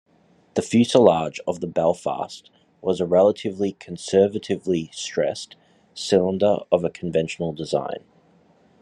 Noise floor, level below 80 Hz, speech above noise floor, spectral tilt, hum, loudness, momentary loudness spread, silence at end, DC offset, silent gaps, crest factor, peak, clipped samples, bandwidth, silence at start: -58 dBFS; -64 dBFS; 37 dB; -5.5 dB/octave; none; -22 LUFS; 15 LU; 0.85 s; under 0.1%; none; 22 dB; -2 dBFS; under 0.1%; 11.5 kHz; 0.55 s